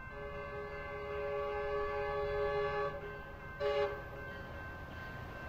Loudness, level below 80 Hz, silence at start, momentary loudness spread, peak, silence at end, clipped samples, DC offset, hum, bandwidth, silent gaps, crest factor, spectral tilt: -40 LUFS; -52 dBFS; 0 s; 11 LU; -22 dBFS; 0 s; under 0.1%; under 0.1%; none; 15.5 kHz; none; 18 dB; -6.5 dB/octave